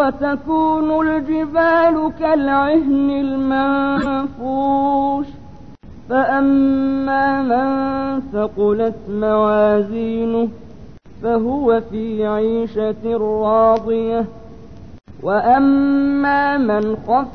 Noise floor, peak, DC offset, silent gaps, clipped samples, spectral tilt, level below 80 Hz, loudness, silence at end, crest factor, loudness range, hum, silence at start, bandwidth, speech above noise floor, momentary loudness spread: -39 dBFS; -2 dBFS; 0.9%; none; under 0.1%; -8.5 dB/octave; -44 dBFS; -17 LUFS; 0 s; 14 dB; 3 LU; none; 0 s; 5 kHz; 23 dB; 7 LU